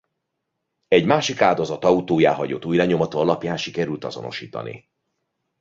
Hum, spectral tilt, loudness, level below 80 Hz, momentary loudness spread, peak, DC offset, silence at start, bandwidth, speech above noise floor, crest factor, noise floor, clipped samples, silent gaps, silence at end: none; -5.5 dB/octave; -20 LUFS; -58 dBFS; 13 LU; -2 dBFS; under 0.1%; 0.9 s; 7.8 kHz; 58 dB; 20 dB; -78 dBFS; under 0.1%; none; 0.85 s